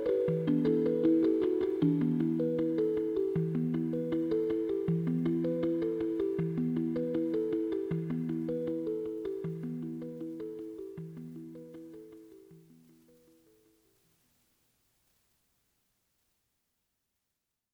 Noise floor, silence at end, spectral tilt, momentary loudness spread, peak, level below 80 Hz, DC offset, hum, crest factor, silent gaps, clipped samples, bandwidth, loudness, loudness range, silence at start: -86 dBFS; 5.15 s; -10 dB/octave; 15 LU; -16 dBFS; -66 dBFS; under 0.1%; none; 16 dB; none; under 0.1%; 5 kHz; -32 LUFS; 17 LU; 0 s